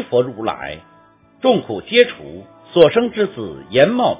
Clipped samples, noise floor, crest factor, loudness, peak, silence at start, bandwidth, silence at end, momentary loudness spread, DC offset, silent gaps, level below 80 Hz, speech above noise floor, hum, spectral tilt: 0.1%; -50 dBFS; 18 dB; -16 LUFS; 0 dBFS; 0 s; 4 kHz; 0 s; 18 LU; under 0.1%; none; -52 dBFS; 34 dB; none; -9.5 dB/octave